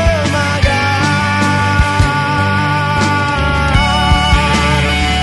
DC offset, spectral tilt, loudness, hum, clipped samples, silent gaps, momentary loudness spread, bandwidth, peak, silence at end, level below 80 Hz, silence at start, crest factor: under 0.1%; -5 dB/octave; -12 LUFS; none; under 0.1%; none; 2 LU; 12 kHz; 0 dBFS; 0 s; -20 dBFS; 0 s; 12 dB